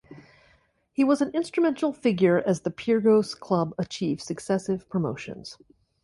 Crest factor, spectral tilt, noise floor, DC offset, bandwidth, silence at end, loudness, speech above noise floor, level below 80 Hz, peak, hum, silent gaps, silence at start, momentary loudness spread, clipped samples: 18 dB; -6.5 dB/octave; -64 dBFS; under 0.1%; 11.5 kHz; 0.5 s; -25 LUFS; 39 dB; -64 dBFS; -8 dBFS; none; none; 0.1 s; 11 LU; under 0.1%